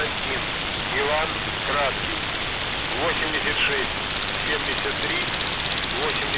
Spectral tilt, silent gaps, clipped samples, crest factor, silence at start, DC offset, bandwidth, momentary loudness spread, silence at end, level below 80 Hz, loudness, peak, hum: -1 dB/octave; none; under 0.1%; 14 dB; 0 s; under 0.1%; 4 kHz; 4 LU; 0 s; -42 dBFS; -23 LUFS; -10 dBFS; none